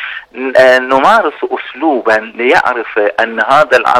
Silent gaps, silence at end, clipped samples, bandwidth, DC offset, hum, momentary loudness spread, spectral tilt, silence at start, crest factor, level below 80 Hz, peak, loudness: none; 0 s; 0.3%; 13.5 kHz; under 0.1%; none; 10 LU; -4 dB/octave; 0 s; 10 dB; -52 dBFS; 0 dBFS; -10 LUFS